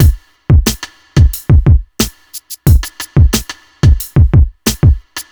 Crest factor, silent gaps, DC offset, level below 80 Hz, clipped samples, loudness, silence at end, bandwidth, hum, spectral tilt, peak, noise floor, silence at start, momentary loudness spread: 10 dB; none; under 0.1%; -14 dBFS; under 0.1%; -12 LUFS; 0.1 s; over 20 kHz; none; -5.5 dB/octave; 0 dBFS; -31 dBFS; 0 s; 10 LU